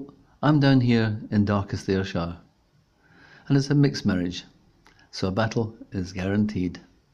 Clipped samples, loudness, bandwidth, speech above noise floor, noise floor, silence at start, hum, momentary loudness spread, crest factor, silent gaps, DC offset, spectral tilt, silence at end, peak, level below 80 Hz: under 0.1%; -24 LUFS; 7.8 kHz; 40 dB; -63 dBFS; 0 s; none; 14 LU; 16 dB; none; under 0.1%; -7 dB/octave; 0.35 s; -8 dBFS; -54 dBFS